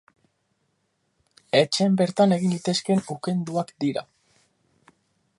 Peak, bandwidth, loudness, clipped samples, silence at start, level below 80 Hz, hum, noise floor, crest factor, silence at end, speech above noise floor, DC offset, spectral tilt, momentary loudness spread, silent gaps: -4 dBFS; 11.5 kHz; -23 LUFS; under 0.1%; 1.55 s; -70 dBFS; none; -72 dBFS; 20 dB; 1.35 s; 50 dB; under 0.1%; -5.5 dB/octave; 8 LU; none